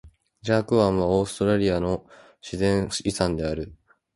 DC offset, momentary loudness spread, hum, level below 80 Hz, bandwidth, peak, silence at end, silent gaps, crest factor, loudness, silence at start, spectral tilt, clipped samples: under 0.1%; 14 LU; none; -44 dBFS; 11.5 kHz; -6 dBFS; 0.4 s; none; 18 dB; -24 LUFS; 0.05 s; -6 dB/octave; under 0.1%